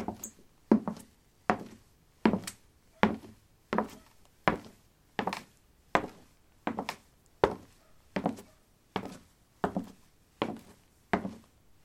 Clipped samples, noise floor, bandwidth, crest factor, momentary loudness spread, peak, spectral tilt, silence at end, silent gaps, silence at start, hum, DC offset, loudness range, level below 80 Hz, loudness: under 0.1%; -63 dBFS; 16.5 kHz; 34 dB; 18 LU; -2 dBFS; -5.5 dB/octave; 0.45 s; none; 0 s; none; under 0.1%; 6 LU; -60 dBFS; -34 LUFS